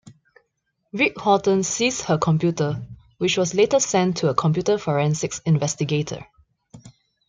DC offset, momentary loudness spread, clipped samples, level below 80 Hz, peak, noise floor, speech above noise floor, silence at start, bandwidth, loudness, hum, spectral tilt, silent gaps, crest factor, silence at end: under 0.1%; 7 LU; under 0.1%; -56 dBFS; -4 dBFS; -74 dBFS; 53 dB; 0.05 s; 9.6 kHz; -21 LUFS; none; -5 dB/octave; none; 20 dB; 0.4 s